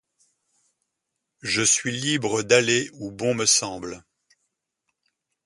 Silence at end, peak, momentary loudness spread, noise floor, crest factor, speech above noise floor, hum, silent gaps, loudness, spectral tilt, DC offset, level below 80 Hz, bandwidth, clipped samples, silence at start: 1.45 s; -2 dBFS; 17 LU; -81 dBFS; 24 dB; 58 dB; none; none; -21 LUFS; -2 dB/octave; under 0.1%; -62 dBFS; 11.5 kHz; under 0.1%; 1.45 s